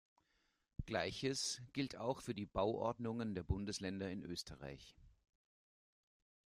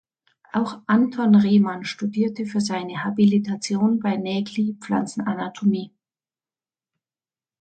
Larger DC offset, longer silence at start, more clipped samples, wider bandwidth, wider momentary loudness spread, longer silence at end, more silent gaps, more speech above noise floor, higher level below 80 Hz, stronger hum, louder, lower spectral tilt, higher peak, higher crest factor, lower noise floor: neither; first, 0.8 s vs 0.55 s; neither; first, 14.5 kHz vs 9 kHz; first, 13 LU vs 10 LU; second, 1.4 s vs 1.75 s; neither; second, 39 dB vs over 69 dB; first, -60 dBFS vs -68 dBFS; neither; second, -43 LUFS vs -22 LUFS; second, -4.5 dB/octave vs -6.5 dB/octave; second, -24 dBFS vs -6 dBFS; about the same, 20 dB vs 16 dB; second, -82 dBFS vs under -90 dBFS